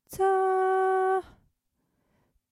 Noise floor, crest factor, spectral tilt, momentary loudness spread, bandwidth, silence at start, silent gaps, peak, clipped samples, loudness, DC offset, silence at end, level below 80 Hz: -77 dBFS; 12 dB; -5 dB/octave; 4 LU; 15 kHz; 0.1 s; none; -16 dBFS; under 0.1%; -25 LUFS; under 0.1%; 1.3 s; -64 dBFS